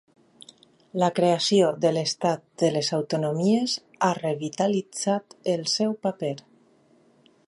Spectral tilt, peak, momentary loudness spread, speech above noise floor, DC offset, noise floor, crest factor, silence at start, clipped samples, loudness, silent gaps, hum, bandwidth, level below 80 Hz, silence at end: -5 dB/octave; -6 dBFS; 8 LU; 36 dB; under 0.1%; -60 dBFS; 18 dB; 0.95 s; under 0.1%; -25 LUFS; none; none; 11.5 kHz; -74 dBFS; 1.05 s